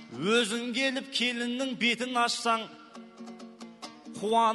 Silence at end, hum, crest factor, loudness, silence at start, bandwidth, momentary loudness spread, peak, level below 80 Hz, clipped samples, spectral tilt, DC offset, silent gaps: 0 s; none; 18 dB; -28 LUFS; 0 s; 12 kHz; 20 LU; -12 dBFS; -80 dBFS; under 0.1%; -3 dB/octave; under 0.1%; none